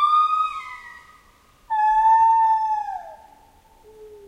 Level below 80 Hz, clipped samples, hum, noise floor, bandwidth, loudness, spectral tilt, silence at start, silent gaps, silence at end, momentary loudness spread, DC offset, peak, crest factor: -56 dBFS; under 0.1%; none; -55 dBFS; 9.2 kHz; -19 LUFS; -1.5 dB/octave; 0 s; none; 0.1 s; 19 LU; under 0.1%; -10 dBFS; 12 dB